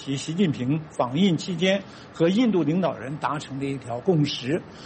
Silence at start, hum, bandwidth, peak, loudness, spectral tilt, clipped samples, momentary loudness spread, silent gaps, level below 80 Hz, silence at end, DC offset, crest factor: 0 s; none; 8.8 kHz; -8 dBFS; -24 LUFS; -6 dB/octave; under 0.1%; 8 LU; none; -60 dBFS; 0 s; under 0.1%; 16 dB